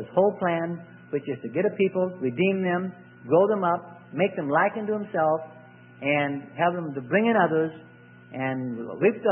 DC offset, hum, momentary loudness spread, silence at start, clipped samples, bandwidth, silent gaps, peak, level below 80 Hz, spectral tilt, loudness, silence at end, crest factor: under 0.1%; none; 11 LU; 0 s; under 0.1%; 3.5 kHz; none; -8 dBFS; -72 dBFS; -11 dB/octave; -25 LUFS; 0 s; 18 dB